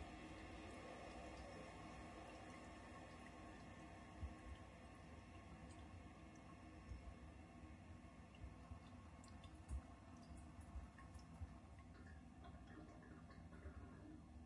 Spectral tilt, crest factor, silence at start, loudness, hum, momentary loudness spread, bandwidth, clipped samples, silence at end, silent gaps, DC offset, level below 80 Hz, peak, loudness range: -6 dB/octave; 18 dB; 0 s; -59 LUFS; none; 5 LU; 11 kHz; under 0.1%; 0 s; none; under 0.1%; -64 dBFS; -40 dBFS; 3 LU